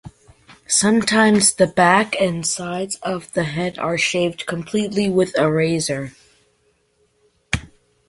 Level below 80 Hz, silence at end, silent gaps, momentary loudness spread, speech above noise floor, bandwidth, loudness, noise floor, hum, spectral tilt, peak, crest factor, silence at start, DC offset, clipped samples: -48 dBFS; 0.4 s; none; 12 LU; 45 dB; 11.5 kHz; -18 LUFS; -63 dBFS; none; -3.5 dB/octave; -2 dBFS; 18 dB; 0.05 s; under 0.1%; under 0.1%